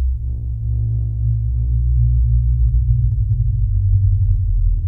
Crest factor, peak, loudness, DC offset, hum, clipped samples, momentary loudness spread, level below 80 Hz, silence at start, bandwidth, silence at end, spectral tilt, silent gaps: 12 dB; -4 dBFS; -18 LUFS; under 0.1%; none; under 0.1%; 6 LU; -18 dBFS; 0 s; 0.7 kHz; 0 s; -13.5 dB/octave; none